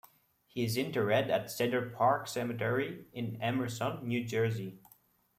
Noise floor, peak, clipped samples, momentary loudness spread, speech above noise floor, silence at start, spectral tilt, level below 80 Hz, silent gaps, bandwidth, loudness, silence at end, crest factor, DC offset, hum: -66 dBFS; -16 dBFS; under 0.1%; 10 LU; 33 dB; 0.55 s; -5.5 dB/octave; -72 dBFS; none; 16 kHz; -33 LUFS; 0.6 s; 18 dB; under 0.1%; none